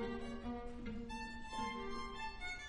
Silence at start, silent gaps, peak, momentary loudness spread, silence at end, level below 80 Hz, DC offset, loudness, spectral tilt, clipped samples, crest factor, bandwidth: 0 s; none; -30 dBFS; 4 LU; 0 s; -54 dBFS; under 0.1%; -46 LUFS; -4.5 dB/octave; under 0.1%; 16 dB; 11 kHz